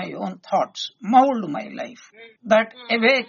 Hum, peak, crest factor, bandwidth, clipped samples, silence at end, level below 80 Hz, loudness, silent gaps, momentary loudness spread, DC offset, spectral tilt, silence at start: none; -2 dBFS; 18 dB; 7.2 kHz; under 0.1%; 0.05 s; -72 dBFS; -21 LUFS; none; 17 LU; under 0.1%; -2 dB/octave; 0 s